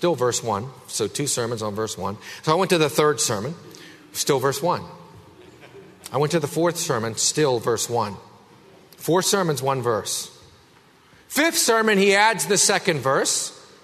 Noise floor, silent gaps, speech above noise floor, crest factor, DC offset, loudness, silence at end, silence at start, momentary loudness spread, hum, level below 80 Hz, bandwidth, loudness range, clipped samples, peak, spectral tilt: -54 dBFS; none; 32 dB; 20 dB; under 0.1%; -21 LUFS; 0.2 s; 0 s; 13 LU; none; -64 dBFS; 13.5 kHz; 6 LU; under 0.1%; -2 dBFS; -3 dB/octave